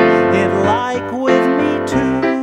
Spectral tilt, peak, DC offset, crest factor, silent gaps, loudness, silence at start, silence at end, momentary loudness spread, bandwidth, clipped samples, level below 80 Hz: -6.5 dB/octave; 0 dBFS; under 0.1%; 14 dB; none; -15 LUFS; 0 s; 0 s; 4 LU; 11 kHz; under 0.1%; -44 dBFS